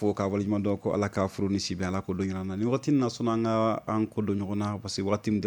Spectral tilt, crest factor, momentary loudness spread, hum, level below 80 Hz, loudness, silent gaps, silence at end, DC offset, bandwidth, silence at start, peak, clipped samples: -6.5 dB/octave; 16 dB; 5 LU; none; -60 dBFS; -29 LUFS; none; 0 s; under 0.1%; 19 kHz; 0 s; -12 dBFS; under 0.1%